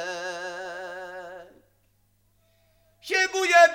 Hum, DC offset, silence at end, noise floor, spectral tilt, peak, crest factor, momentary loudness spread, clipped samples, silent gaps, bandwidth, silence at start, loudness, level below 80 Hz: 50 Hz at -70 dBFS; under 0.1%; 0 s; -67 dBFS; -1 dB/octave; -4 dBFS; 22 dB; 24 LU; under 0.1%; none; 16 kHz; 0 s; -25 LUFS; -70 dBFS